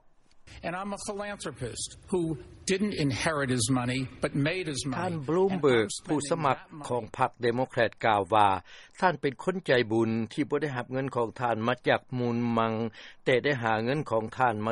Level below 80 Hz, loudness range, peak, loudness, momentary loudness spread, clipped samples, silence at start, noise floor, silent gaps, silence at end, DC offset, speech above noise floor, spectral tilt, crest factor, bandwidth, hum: -58 dBFS; 3 LU; -8 dBFS; -29 LUFS; 10 LU; under 0.1%; 0.35 s; -55 dBFS; none; 0 s; under 0.1%; 27 dB; -5 dB/octave; 22 dB; 11.5 kHz; none